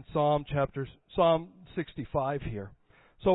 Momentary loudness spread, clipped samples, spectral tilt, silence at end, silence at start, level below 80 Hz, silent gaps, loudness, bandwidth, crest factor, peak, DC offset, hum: 14 LU; under 0.1%; -11 dB/octave; 0 s; 0.1 s; -50 dBFS; none; -31 LUFS; 4.1 kHz; 16 dB; -14 dBFS; under 0.1%; none